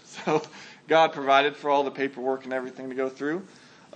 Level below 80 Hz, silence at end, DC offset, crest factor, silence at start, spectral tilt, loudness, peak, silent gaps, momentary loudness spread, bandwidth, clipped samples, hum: -84 dBFS; 0.5 s; under 0.1%; 20 dB; 0.1 s; -4.5 dB/octave; -26 LUFS; -6 dBFS; none; 13 LU; 8.8 kHz; under 0.1%; none